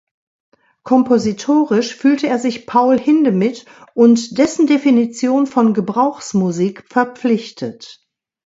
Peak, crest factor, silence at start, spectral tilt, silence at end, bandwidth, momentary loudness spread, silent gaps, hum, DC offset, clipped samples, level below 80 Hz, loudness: 0 dBFS; 16 dB; 0.85 s; -6 dB/octave; 0.55 s; 8 kHz; 7 LU; none; none; under 0.1%; under 0.1%; -60 dBFS; -15 LUFS